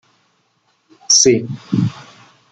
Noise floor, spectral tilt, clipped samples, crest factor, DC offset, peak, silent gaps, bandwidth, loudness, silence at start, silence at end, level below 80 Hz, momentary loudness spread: -62 dBFS; -3 dB/octave; under 0.1%; 18 dB; under 0.1%; 0 dBFS; none; 11 kHz; -14 LUFS; 1.1 s; 0.5 s; -56 dBFS; 11 LU